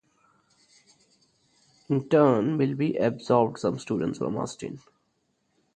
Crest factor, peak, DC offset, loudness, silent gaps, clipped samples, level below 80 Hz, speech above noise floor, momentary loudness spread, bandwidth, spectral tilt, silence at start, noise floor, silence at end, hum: 22 dB; -6 dBFS; under 0.1%; -25 LUFS; none; under 0.1%; -66 dBFS; 48 dB; 13 LU; 9.2 kHz; -7.5 dB/octave; 1.9 s; -73 dBFS; 1 s; none